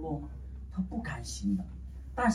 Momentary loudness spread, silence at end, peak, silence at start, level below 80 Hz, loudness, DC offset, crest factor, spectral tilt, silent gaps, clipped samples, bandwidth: 11 LU; 0 s; -16 dBFS; 0 s; -44 dBFS; -37 LUFS; under 0.1%; 20 dB; -6 dB/octave; none; under 0.1%; 13 kHz